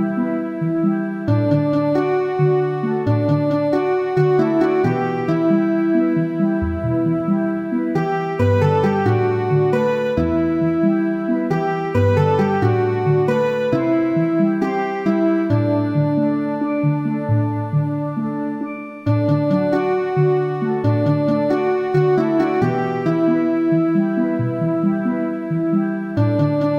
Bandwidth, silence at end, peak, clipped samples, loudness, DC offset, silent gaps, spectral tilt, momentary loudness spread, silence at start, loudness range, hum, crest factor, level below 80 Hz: 7.4 kHz; 0 s; -4 dBFS; under 0.1%; -19 LUFS; under 0.1%; none; -9.5 dB/octave; 4 LU; 0 s; 2 LU; none; 12 dB; -46 dBFS